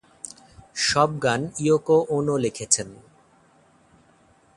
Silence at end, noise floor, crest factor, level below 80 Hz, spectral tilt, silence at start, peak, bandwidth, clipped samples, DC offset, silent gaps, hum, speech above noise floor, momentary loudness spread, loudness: 1.6 s; -58 dBFS; 24 dB; -58 dBFS; -3.5 dB/octave; 0.25 s; -2 dBFS; 11.5 kHz; under 0.1%; under 0.1%; none; none; 36 dB; 19 LU; -22 LUFS